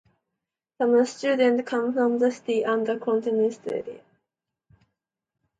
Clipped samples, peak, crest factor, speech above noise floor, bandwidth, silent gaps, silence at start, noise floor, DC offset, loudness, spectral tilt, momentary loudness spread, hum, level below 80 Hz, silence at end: under 0.1%; -8 dBFS; 16 dB; 62 dB; 9.2 kHz; none; 0.8 s; -85 dBFS; under 0.1%; -24 LUFS; -5 dB/octave; 9 LU; none; -74 dBFS; 1.6 s